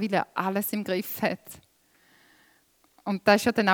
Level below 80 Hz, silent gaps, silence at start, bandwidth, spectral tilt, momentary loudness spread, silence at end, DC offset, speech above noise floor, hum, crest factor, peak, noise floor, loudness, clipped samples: -66 dBFS; none; 0 s; over 20 kHz; -4.5 dB/octave; 16 LU; 0 s; under 0.1%; 39 dB; none; 22 dB; -6 dBFS; -64 dBFS; -26 LUFS; under 0.1%